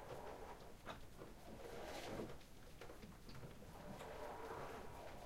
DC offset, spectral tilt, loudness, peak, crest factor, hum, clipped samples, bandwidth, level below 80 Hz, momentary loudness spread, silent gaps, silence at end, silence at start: under 0.1%; -5 dB/octave; -55 LUFS; -36 dBFS; 16 dB; none; under 0.1%; 16 kHz; -62 dBFS; 8 LU; none; 0 s; 0 s